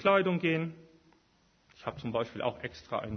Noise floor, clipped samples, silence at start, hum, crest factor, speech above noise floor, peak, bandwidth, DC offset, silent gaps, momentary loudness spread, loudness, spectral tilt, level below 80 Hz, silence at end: -68 dBFS; under 0.1%; 0 s; none; 20 dB; 37 dB; -12 dBFS; 6.4 kHz; under 0.1%; none; 15 LU; -33 LUFS; -7 dB/octave; -62 dBFS; 0 s